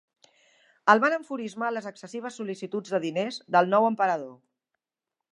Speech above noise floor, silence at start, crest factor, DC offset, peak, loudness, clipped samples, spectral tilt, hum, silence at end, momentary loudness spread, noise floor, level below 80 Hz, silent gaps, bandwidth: 62 dB; 0.85 s; 24 dB; under 0.1%; -4 dBFS; -26 LUFS; under 0.1%; -5 dB/octave; none; 0.95 s; 15 LU; -88 dBFS; -82 dBFS; none; 11 kHz